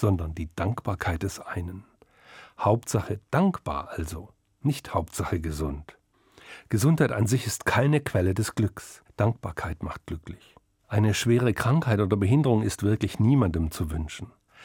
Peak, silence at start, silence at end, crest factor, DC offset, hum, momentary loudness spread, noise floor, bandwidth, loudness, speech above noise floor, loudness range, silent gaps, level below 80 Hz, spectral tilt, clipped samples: -8 dBFS; 0 s; 0 s; 18 dB; under 0.1%; none; 16 LU; -55 dBFS; 17.5 kHz; -26 LUFS; 30 dB; 6 LU; none; -46 dBFS; -6.5 dB/octave; under 0.1%